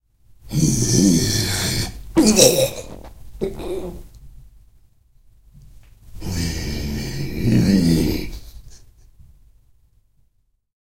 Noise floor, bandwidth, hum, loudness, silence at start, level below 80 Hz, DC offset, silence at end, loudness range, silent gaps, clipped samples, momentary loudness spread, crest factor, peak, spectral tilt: -64 dBFS; 16 kHz; none; -19 LUFS; 0.45 s; -36 dBFS; under 0.1%; 2.1 s; 15 LU; none; under 0.1%; 21 LU; 22 dB; 0 dBFS; -4.5 dB/octave